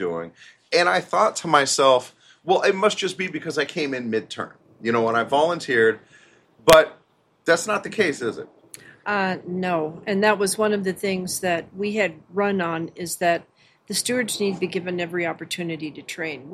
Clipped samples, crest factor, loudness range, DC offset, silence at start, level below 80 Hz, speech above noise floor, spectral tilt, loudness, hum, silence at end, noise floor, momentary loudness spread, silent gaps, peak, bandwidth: under 0.1%; 22 dB; 5 LU; under 0.1%; 0 s; -58 dBFS; 32 dB; -3.5 dB/octave; -22 LUFS; none; 0 s; -54 dBFS; 12 LU; none; 0 dBFS; 15.5 kHz